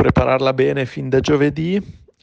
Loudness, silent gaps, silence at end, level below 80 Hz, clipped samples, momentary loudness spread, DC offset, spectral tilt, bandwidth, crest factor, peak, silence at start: -18 LUFS; none; 0.3 s; -36 dBFS; under 0.1%; 7 LU; under 0.1%; -7 dB/octave; 8 kHz; 14 dB; -4 dBFS; 0 s